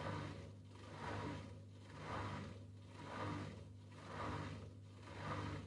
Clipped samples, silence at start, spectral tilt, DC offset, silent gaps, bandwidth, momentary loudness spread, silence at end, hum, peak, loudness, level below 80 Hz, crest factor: under 0.1%; 0 s; -6 dB/octave; under 0.1%; none; 11 kHz; 10 LU; 0 s; 50 Hz at -55 dBFS; -32 dBFS; -50 LUFS; -66 dBFS; 18 dB